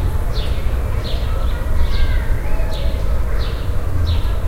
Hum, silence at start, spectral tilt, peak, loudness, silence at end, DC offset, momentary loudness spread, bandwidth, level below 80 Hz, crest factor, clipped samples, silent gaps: none; 0 s; -6.5 dB/octave; -4 dBFS; -22 LUFS; 0 s; under 0.1%; 3 LU; 15.5 kHz; -18 dBFS; 12 dB; under 0.1%; none